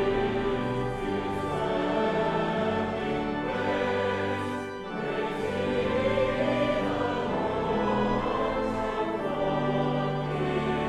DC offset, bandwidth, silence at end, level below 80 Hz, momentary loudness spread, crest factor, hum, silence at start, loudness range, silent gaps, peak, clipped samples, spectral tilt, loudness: under 0.1%; 12.5 kHz; 0 s; -46 dBFS; 4 LU; 14 dB; none; 0 s; 2 LU; none; -14 dBFS; under 0.1%; -7 dB/octave; -28 LUFS